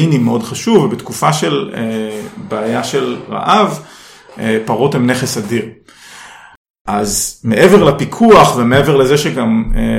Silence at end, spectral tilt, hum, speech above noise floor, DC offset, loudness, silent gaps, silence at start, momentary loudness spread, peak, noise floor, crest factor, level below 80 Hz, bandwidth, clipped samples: 0 s; -5 dB/octave; none; 25 dB; under 0.1%; -13 LUFS; 6.57-6.74 s, 6.81-6.85 s; 0 s; 13 LU; 0 dBFS; -37 dBFS; 12 dB; -30 dBFS; 16.5 kHz; 0.6%